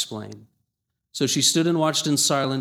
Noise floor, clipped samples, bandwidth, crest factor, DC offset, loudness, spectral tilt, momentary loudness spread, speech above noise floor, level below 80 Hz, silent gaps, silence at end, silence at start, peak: -80 dBFS; under 0.1%; 18.5 kHz; 18 dB; under 0.1%; -20 LUFS; -3.5 dB/octave; 18 LU; 57 dB; -70 dBFS; none; 0 s; 0 s; -6 dBFS